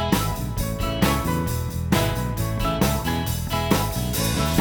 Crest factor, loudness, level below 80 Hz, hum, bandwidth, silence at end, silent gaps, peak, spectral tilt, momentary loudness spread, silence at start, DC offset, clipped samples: 18 dB; -23 LUFS; -32 dBFS; none; over 20 kHz; 0 s; none; -4 dBFS; -5 dB/octave; 5 LU; 0 s; under 0.1%; under 0.1%